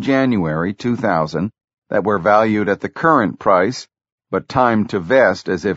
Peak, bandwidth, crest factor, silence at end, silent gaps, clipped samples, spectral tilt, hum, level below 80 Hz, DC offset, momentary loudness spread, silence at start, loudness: 0 dBFS; 8 kHz; 16 dB; 0 s; 1.64-1.68 s, 1.78-1.82 s, 4.12-4.18 s; under 0.1%; -5 dB/octave; none; -50 dBFS; under 0.1%; 8 LU; 0 s; -17 LUFS